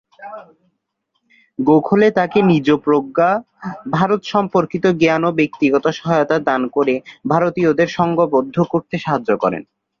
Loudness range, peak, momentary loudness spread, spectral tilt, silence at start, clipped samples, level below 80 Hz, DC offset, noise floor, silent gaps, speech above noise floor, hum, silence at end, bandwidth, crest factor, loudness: 1 LU; 0 dBFS; 8 LU; -7.5 dB/octave; 0.2 s; under 0.1%; -56 dBFS; under 0.1%; -71 dBFS; none; 55 dB; none; 0.35 s; 7.2 kHz; 16 dB; -16 LUFS